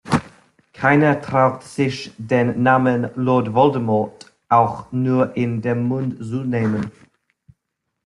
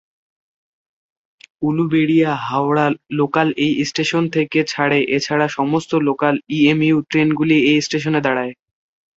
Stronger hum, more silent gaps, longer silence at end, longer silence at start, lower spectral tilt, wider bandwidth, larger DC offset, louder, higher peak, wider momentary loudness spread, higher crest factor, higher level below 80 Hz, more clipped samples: neither; neither; first, 1.15 s vs 0.65 s; second, 0.05 s vs 1.6 s; first, -7.5 dB/octave vs -5.5 dB/octave; first, 11.5 kHz vs 8 kHz; neither; about the same, -19 LUFS vs -17 LUFS; about the same, -2 dBFS vs -2 dBFS; first, 8 LU vs 5 LU; about the same, 18 dB vs 16 dB; first, -54 dBFS vs -60 dBFS; neither